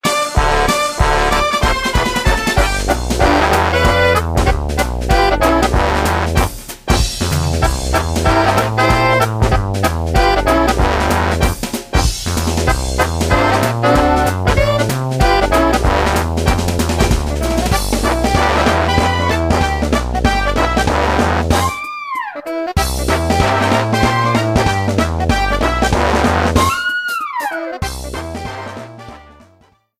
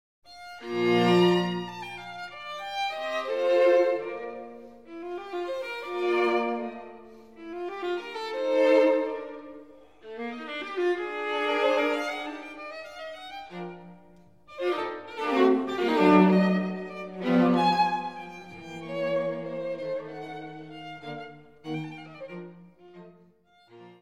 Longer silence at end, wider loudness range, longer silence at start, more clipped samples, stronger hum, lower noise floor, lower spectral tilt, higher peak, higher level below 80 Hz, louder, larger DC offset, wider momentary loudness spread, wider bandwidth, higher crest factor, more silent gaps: first, 0.8 s vs 0.05 s; second, 2 LU vs 12 LU; second, 0.05 s vs 0.3 s; neither; neither; second, -52 dBFS vs -60 dBFS; second, -5 dB/octave vs -6.5 dB/octave; first, 0 dBFS vs -8 dBFS; first, -22 dBFS vs -70 dBFS; first, -15 LUFS vs -26 LUFS; second, under 0.1% vs 0.1%; second, 7 LU vs 20 LU; first, 16 kHz vs 13 kHz; second, 14 dB vs 20 dB; neither